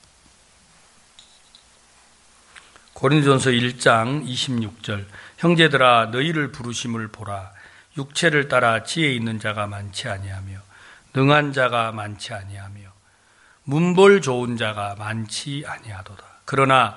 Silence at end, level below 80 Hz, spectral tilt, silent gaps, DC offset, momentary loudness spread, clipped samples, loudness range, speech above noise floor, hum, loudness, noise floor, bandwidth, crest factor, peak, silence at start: 0 s; -60 dBFS; -5 dB/octave; none; under 0.1%; 20 LU; under 0.1%; 4 LU; 36 dB; none; -20 LUFS; -56 dBFS; 11.5 kHz; 20 dB; 0 dBFS; 2.95 s